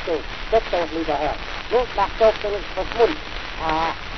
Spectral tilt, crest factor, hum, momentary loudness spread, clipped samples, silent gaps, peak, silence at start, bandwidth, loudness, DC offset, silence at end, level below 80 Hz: -5 dB/octave; 18 dB; none; 8 LU; under 0.1%; none; -4 dBFS; 0 s; 6.4 kHz; -22 LUFS; 1%; 0 s; -36 dBFS